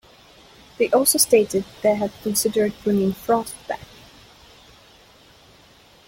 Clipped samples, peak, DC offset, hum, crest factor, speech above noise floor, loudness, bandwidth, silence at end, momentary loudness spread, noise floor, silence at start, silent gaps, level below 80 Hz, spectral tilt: under 0.1%; -2 dBFS; under 0.1%; none; 22 dB; 31 dB; -20 LUFS; 16.5 kHz; 2.25 s; 14 LU; -51 dBFS; 0.8 s; none; -56 dBFS; -3.5 dB/octave